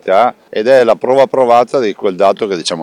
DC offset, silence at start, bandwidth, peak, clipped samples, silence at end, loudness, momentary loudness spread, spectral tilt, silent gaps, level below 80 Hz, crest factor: under 0.1%; 0.05 s; 11 kHz; 0 dBFS; under 0.1%; 0 s; -11 LUFS; 7 LU; -4.5 dB/octave; none; -58 dBFS; 10 dB